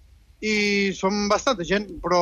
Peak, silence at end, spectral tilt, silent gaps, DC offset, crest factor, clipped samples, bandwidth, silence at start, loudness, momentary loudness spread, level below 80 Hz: -10 dBFS; 0 s; -4 dB/octave; none; under 0.1%; 14 dB; under 0.1%; 10.5 kHz; 0.4 s; -23 LUFS; 5 LU; -48 dBFS